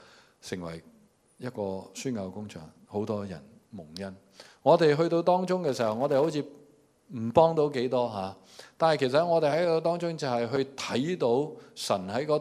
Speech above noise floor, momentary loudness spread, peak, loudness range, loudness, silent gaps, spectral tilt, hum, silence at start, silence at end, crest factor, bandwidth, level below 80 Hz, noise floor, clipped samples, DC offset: 32 dB; 18 LU; -6 dBFS; 11 LU; -28 LUFS; none; -6 dB/octave; none; 0.45 s; 0 s; 22 dB; 14 kHz; -70 dBFS; -60 dBFS; under 0.1%; under 0.1%